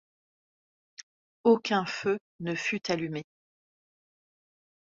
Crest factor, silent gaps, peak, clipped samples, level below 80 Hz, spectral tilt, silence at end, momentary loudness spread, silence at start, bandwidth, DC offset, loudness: 22 dB; 1.03-1.44 s, 2.21-2.39 s; -12 dBFS; under 0.1%; -74 dBFS; -5 dB/octave; 1.65 s; 22 LU; 1 s; 7.6 kHz; under 0.1%; -29 LUFS